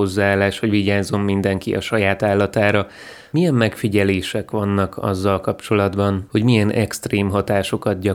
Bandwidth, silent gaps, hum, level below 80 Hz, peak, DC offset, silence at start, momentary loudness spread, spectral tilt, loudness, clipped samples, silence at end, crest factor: 16.5 kHz; none; none; -50 dBFS; 0 dBFS; under 0.1%; 0 s; 5 LU; -6.5 dB/octave; -19 LUFS; under 0.1%; 0 s; 18 dB